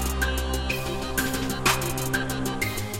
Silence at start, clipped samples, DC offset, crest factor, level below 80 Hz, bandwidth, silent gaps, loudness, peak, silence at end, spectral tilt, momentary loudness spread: 0 s; under 0.1%; under 0.1%; 18 dB; -34 dBFS; 17 kHz; none; -26 LUFS; -8 dBFS; 0 s; -3.5 dB/octave; 5 LU